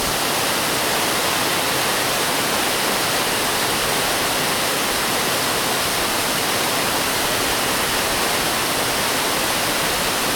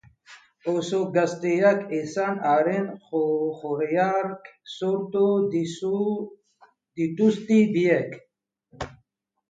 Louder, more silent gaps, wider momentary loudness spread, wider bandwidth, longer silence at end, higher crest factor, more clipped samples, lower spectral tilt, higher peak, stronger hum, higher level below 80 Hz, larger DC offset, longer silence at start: first, -18 LUFS vs -24 LUFS; neither; second, 0 LU vs 18 LU; first, 19.5 kHz vs 9 kHz; second, 0 s vs 0.6 s; about the same, 14 dB vs 18 dB; neither; second, -1.5 dB/octave vs -6.5 dB/octave; about the same, -6 dBFS vs -6 dBFS; neither; first, -44 dBFS vs -62 dBFS; neither; second, 0 s vs 0.3 s